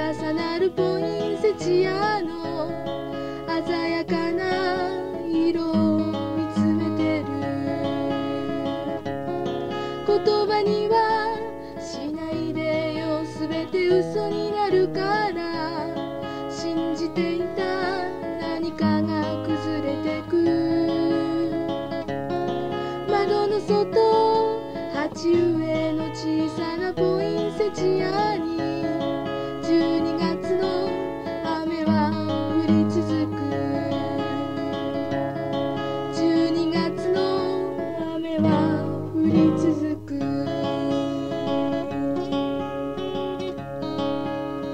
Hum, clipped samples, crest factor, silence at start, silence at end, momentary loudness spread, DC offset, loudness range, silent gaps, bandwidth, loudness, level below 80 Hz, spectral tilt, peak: none; under 0.1%; 16 dB; 0 s; 0 s; 8 LU; 0.4%; 3 LU; none; 9.4 kHz; -24 LUFS; -54 dBFS; -7 dB/octave; -8 dBFS